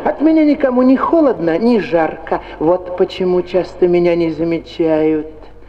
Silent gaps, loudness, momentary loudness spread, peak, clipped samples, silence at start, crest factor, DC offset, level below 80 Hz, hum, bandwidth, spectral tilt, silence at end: none; -14 LUFS; 7 LU; -2 dBFS; under 0.1%; 0 s; 12 dB; under 0.1%; -42 dBFS; none; 6.6 kHz; -8 dB/octave; 0.05 s